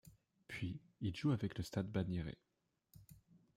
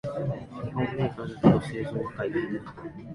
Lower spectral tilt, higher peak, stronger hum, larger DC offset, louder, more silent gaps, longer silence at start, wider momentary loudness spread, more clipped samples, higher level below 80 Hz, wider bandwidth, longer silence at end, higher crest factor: second, -7 dB/octave vs -8.5 dB/octave; second, -26 dBFS vs -6 dBFS; neither; neither; second, -43 LUFS vs -28 LUFS; neither; about the same, 0.05 s vs 0.05 s; first, 18 LU vs 14 LU; neither; second, -66 dBFS vs -52 dBFS; first, 16 kHz vs 11.5 kHz; first, 0.2 s vs 0 s; about the same, 18 dB vs 22 dB